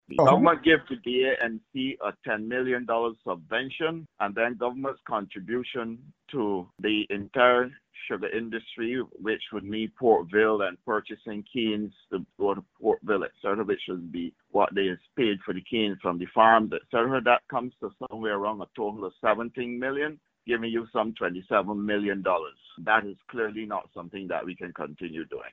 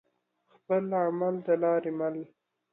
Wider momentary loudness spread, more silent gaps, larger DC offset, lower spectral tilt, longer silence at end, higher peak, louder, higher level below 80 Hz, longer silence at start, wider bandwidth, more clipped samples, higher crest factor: first, 14 LU vs 9 LU; neither; neither; second, -3 dB/octave vs -11.5 dB/octave; second, 0.05 s vs 0.45 s; first, -4 dBFS vs -14 dBFS; about the same, -27 LUFS vs -29 LUFS; first, -64 dBFS vs -82 dBFS; second, 0.1 s vs 0.7 s; first, 7.4 kHz vs 3.7 kHz; neither; first, 24 dB vs 16 dB